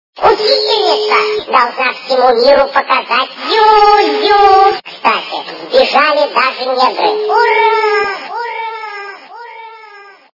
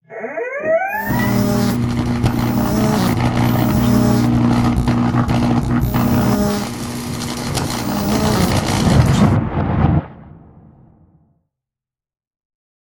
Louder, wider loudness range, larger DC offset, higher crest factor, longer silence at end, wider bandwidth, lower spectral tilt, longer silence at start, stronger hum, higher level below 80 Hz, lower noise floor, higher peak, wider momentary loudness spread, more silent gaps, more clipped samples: first, -11 LUFS vs -17 LUFS; about the same, 4 LU vs 3 LU; neither; about the same, 12 dB vs 16 dB; second, 0.3 s vs 2.5 s; second, 6 kHz vs 17.5 kHz; second, -2.5 dB/octave vs -6.5 dB/octave; about the same, 0.15 s vs 0.1 s; neither; second, -48 dBFS vs -30 dBFS; second, -37 dBFS vs -88 dBFS; about the same, 0 dBFS vs 0 dBFS; first, 15 LU vs 8 LU; neither; first, 0.3% vs under 0.1%